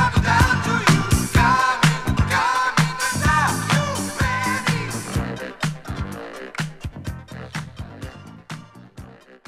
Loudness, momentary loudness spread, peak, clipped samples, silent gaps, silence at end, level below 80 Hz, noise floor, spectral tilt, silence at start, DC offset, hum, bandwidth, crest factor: -20 LUFS; 19 LU; -2 dBFS; under 0.1%; none; 0.1 s; -34 dBFS; -42 dBFS; -4.5 dB/octave; 0 s; under 0.1%; none; 15.5 kHz; 20 dB